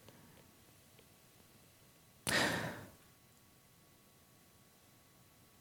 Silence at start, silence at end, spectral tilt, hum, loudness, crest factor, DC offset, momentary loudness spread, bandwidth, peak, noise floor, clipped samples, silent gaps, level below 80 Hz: 0.05 s; 2.65 s; -3 dB/octave; none; -37 LUFS; 30 dB; under 0.1%; 29 LU; 18 kHz; -16 dBFS; -66 dBFS; under 0.1%; none; -72 dBFS